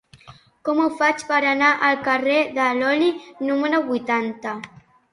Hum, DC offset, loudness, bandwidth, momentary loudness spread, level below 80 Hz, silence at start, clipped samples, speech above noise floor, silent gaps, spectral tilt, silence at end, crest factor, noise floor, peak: none; under 0.1%; -20 LUFS; 11.5 kHz; 13 LU; -66 dBFS; 0.25 s; under 0.1%; 28 dB; none; -4 dB/octave; 0.45 s; 18 dB; -48 dBFS; -4 dBFS